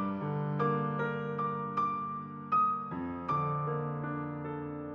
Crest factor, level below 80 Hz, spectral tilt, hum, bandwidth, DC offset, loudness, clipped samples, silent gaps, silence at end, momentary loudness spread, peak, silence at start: 14 dB; -70 dBFS; -9.5 dB/octave; none; 6 kHz; under 0.1%; -34 LUFS; under 0.1%; none; 0 s; 9 LU; -20 dBFS; 0 s